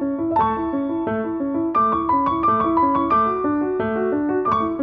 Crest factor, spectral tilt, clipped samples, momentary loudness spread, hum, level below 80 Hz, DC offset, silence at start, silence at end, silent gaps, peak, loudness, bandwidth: 12 dB; -9.5 dB/octave; under 0.1%; 5 LU; none; -48 dBFS; under 0.1%; 0 s; 0 s; none; -6 dBFS; -20 LUFS; 5.2 kHz